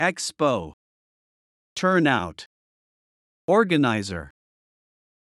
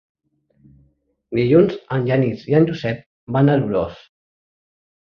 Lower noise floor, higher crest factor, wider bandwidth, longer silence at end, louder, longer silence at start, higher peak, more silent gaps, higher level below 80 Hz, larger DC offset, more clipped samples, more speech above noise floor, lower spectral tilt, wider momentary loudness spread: first, under -90 dBFS vs -61 dBFS; about the same, 20 dB vs 18 dB; first, 12 kHz vs 6.4 kHz; second, 1.05 s vs 1.2 s; second, -22 LUFS vs -18 LUFS; second, 0 s vs 1.3 s; second, -6 dBFS vs -2 dBFS; first, 0.73-1.76 s, 2.46-3.48 s vs 3.06-3.27 s; second, -60 dBFS vs -52 dBFS; neither; neither; first, over 68 dB vs 44 dB; second, -5 dB/octave vs -9.5 dB/octave; first, 17 LU vs 11 LU